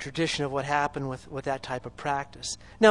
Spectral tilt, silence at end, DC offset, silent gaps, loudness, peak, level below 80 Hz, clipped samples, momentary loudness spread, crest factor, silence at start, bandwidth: -4 dB/octave; 0 s; under 0.1%; none; -30 LUFS; -4 dBFS; -54 dBFS; under 0.1%; 8 LU; 24 dB; 0 s; 11.5 kHz